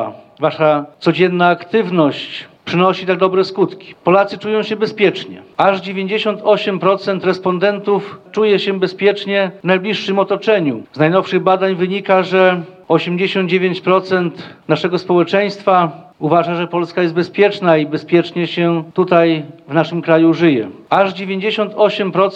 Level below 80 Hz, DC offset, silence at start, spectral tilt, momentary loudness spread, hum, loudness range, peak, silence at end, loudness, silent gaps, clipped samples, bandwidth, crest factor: -68 dBFS; under 0.1%; 0 s; -7 dB/octave; 7 LU; none; 2 LU; 0 dBFS; 0 s; -15 LUFS; none; under 0.1%; 8 kHz; 14 dB